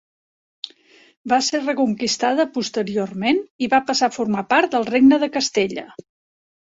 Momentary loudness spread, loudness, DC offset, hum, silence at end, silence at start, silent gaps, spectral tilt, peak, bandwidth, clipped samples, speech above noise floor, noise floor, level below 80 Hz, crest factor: 16 LU; -19 LUFS; under 0.1%; none; 0.75 s; 1.25 s; 3.50-3.59 s; -3.5 dB/octave; -4 dBFS; 8 kHz; under 0.1%; 33 dB; -52 dBFS; -62 dBFS; 16 dB